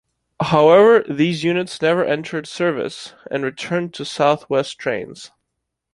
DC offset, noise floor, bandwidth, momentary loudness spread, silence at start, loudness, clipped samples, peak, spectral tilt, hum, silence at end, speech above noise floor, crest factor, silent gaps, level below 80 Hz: under 0.1%; -78 dBFS; 11.5 kHz; 15 LU; 0.4 s; -18 LUFS; under 0.1%; -2 dBFS; -5.5 dB/octave; none; 0.65 s; 60 dB; 18 dB; none; -58 dBFS